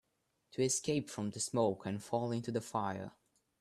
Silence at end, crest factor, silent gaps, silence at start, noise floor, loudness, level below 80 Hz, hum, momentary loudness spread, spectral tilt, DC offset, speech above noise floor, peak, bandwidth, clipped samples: 0.5 s; 18 dB; none; 0.55 s; -81 dBFS; -37 LUFS; -74 dBFS; none; 9 LU; -4.5 dB/octave; under 0.1%; 45 dB; -18 dBFS; 13.5 kHz; under 0.1%